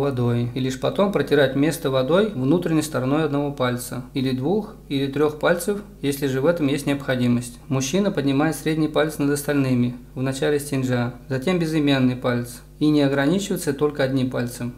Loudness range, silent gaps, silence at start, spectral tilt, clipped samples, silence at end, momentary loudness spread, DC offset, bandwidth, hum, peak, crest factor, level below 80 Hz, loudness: 2 LU; none; 0 s; -6 dB/octave; under 0.1%; 0 s; 7 LU; under 0.1%; 16 kHz; none; -6 dBFS; 16 dB; -46 dBFS; -22 LUFS